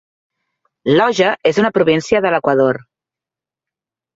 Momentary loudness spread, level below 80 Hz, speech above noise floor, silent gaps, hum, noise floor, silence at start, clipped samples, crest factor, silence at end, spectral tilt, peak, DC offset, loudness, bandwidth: 4 LU; -56 dBFS; 74 dB; none; none; -88 dBFS; 0.85 s; under 0.1%; 16 dB; 1.35 s; -5.5 dB/octave; -2 dBFS; under 0.1%; -15 LUFS; 7.8 kHz